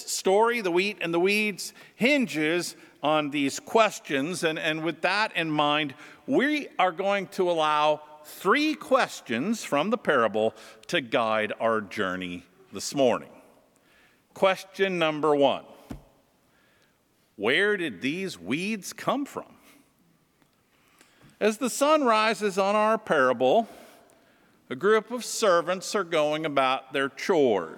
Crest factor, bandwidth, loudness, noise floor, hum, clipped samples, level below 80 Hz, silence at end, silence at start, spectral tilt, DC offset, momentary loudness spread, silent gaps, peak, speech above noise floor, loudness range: 20 dB; 18.5 kHz; -25 LUFS; -67 dBFS; none; under 0.1%; -70 dBFS; 0 s; 0 s; -4 dB/octave; under 0.1%; 10 LU; none; -8 dBFS; 41 dB; 5 LU